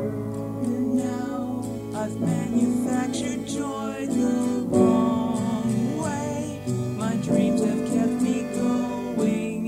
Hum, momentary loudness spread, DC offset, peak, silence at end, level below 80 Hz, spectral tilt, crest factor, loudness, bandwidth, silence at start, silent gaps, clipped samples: none; 8 LU; under 0.1%; -6 dBFS; 0 s; -54 dBFS; -6.5 dB/octave; 18 dB; -25 LUFS; 15.5 kHz; 0 s; none; under 0.1%